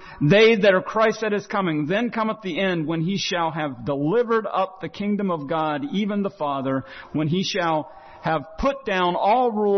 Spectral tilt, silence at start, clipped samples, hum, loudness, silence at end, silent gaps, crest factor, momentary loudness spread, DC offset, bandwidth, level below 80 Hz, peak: -6 dB/octave; 0 s; under 0.1%; none; -22 LUFS; 0 s; none; 16 dB; 8 LU; under 0.1%; 6.4 kHz; -50 dBFS; -6 dBFS